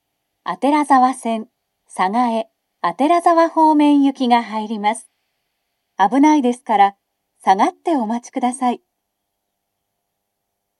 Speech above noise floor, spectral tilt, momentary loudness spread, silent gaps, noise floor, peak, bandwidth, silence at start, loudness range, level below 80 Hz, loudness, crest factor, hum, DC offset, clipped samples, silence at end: 60 dB; -4.5 dB/octave; 12 LU; none; -76 dBFS; 0 dBFS; 12 kHz; 0.45 s; 5 LU; -78 dBFS; -17 LUFS; 18 dB; none; under 0.1%; under 0.1%; 2.05 s